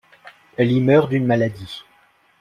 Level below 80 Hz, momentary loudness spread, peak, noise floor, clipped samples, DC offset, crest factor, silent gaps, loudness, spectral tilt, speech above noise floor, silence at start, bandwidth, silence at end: -56 dBFS; 19 LU; -2 dBFS; -57 dBFS; under 0.1%; under 0.1%; 18 dB; none; -18 LUFS; -8.5 dB/octave; 39 dB; 0.25 s; 11 kHz; 0.6 s